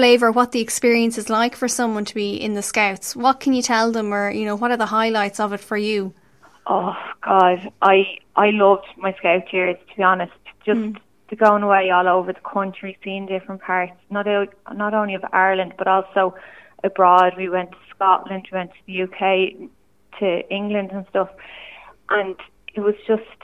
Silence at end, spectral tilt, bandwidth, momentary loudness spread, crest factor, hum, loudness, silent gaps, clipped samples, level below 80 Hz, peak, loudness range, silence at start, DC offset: 0.2 s; -4 dB/octave; 15 kHz; 13 LU; 20 dB; none; -20 LUFS; none; under 0.1%; -64 dBFS; 0 dBFS; 6 LU; 0 s; 0.1%